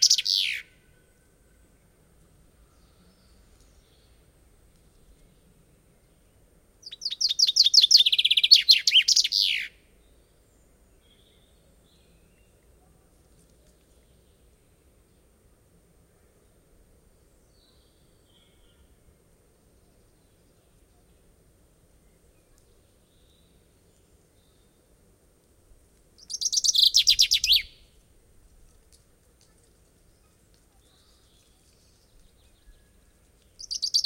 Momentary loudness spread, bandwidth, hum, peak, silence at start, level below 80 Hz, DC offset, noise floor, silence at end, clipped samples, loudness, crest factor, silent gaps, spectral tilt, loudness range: 20 LU; 16 kHz; none; -2 dBFS; 0 s; -60 dBFS; under 0.1%; -61 dBFS; 0 s; under 0.1%; -18 LUFS; 26 dB; none; 3.5 dB/octave; 16 LU